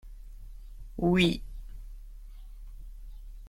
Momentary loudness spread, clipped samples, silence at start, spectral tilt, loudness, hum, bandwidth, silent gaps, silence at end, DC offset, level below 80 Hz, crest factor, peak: 26 LU; under 0.1%; 0.05 s; -6 dB/octave; -27 LUFS; none; 15 kHz; none; 0 s; under 0.1%; -42 dBFS; 22 dB; -12 dBFS